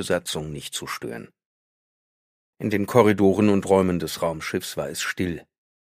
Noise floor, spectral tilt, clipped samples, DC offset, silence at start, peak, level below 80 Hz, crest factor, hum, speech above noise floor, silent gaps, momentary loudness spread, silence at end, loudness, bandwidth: under -90 dBFS; -5.5 dB/octave; under 0.1%; under 0.1%; 0 s; -2 dBFS; -54 dBFS; 22 dB; none; over 67 dB; 1.45-2.53 s; 13 LU; 0.4 s; -23 LUFS; 15.5 kHz